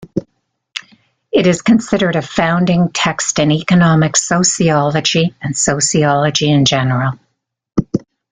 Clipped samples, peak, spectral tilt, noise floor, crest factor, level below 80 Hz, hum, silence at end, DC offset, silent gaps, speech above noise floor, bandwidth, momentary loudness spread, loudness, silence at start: under 0.1%; 0 dBFS; -4.5 dB/octave; -68 dBFS; 14 dB; -46 dBFS; none; 0.3 s; under 0.1%; none; 55 dB; 9.6 kHz; 11 LU; -13 LUFS; 0 s